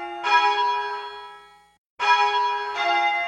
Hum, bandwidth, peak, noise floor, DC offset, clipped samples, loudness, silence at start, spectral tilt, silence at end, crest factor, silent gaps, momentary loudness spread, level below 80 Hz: none; 9.6 kHz; -6 dBFS; -48 dBFS; under 0.1%; under 0.1%; -21 LUFS; 0 s; 0 dB/octave; 0 s; 18 dB; 1.78-1.97 s; 16 LU; -68 dBFS